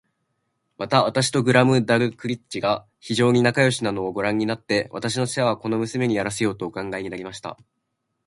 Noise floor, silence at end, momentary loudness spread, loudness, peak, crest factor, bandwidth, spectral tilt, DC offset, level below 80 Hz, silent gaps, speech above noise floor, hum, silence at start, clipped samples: -74 dBFS; 0.75 s; 12 LU; -22 LUFS; -2 dBFS; 22 dB; 11.5 kHz; -5 dB/octave; under 0.1%; -58 dBFS; none; 52 dB; none; 0.8 s; under 0.1%